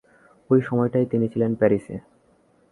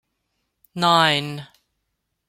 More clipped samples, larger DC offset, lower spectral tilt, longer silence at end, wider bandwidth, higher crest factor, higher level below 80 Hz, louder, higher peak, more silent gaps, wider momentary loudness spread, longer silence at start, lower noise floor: neither; neither; first, -10 dB/octave vs -4 dB/octave; second, 0.7 s vs 0.85 s; second, 11 kHz vs 16.5 kHz; about the same, 18 dB vs 22 dB; first, -58 dBFS vs -66 dBFS; second, -22 LUFS vs -18 LUFS; about the same, -4 dBFS vs -2 dBFS; neither; second, 9 LU vs 21 LU; second, 0.5 s vs 0.75 s; second, -60 dBFS vs -76 dBFS